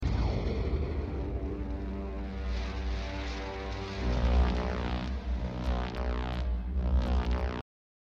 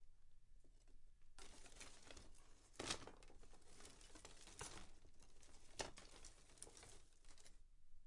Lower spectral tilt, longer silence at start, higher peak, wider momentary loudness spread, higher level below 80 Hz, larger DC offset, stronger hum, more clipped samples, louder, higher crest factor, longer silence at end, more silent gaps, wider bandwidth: first, -7.5 dB/octave vs -2 dB/octave; about the same, 0 s vs 0 s; first, -16 dBFS vs -28 dBFS; second, 8 LU vs 18 LU; first, -32 dBFS vs -66 dBFS; neither; neither; neither; first, -34 LUFS vs -57 LUFS; second, 16 dB vs 30 dB; first, 0.55 s vs 0 s; neither; second, 7 kHz vs 11.5 kHz